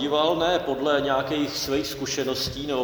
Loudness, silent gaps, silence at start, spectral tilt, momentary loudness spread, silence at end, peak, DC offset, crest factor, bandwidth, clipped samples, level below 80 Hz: -25 LUFS; none; 0 s; -3.5 dB/octave; 5 LU; 0 s; -8 dBFS; under 0.1%; 16 dB; over 20 kHz; under 0.1%; -50 dBFS